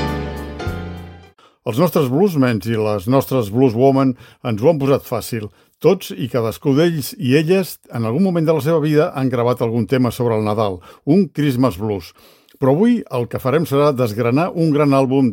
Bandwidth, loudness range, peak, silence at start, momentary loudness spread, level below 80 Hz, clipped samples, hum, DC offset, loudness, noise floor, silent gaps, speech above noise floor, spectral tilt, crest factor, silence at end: 17 kHz; 2 LU; 0 dBFS; 0 s; 12 LU; -44 dBFS; under 0.1%; none; under 0.1%; -17 LUFS; -46 dBFS; none; 30 dB; -7 dB/octave; 16 dB; 0 s